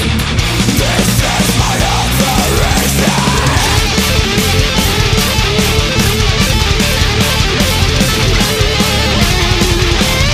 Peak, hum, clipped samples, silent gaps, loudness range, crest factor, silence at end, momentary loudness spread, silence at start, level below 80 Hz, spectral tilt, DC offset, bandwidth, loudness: 0 dBFS; none; under 0.1%; none; 0 LU; 12 dB; 0 s; 1 LU; 0 s; -18 dBFS; -3.5 dB/octave; under 0.1%; 15.5 kHz; -11 LUFS